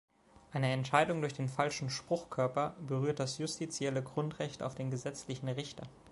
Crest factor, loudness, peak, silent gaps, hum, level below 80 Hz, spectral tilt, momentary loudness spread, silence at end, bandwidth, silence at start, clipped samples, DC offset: 24 dB; -36 LUFS; -12 dBFS; none; none; -68 dBFS; -5 dB/octave; 10 LU; 0 s; 11.5 kHz; 0.5 s; under 0.1%; under 0.1%